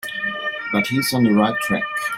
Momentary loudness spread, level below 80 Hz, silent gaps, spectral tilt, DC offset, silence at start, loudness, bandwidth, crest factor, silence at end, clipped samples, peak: 7 LU; -56 dBFS; none; -4.5 dB/octave; under 0.1%; 0.05 s; -20 LUFS; 16.5 kHz; 16 dB; 0 s; under 0.1%; -4 dBFS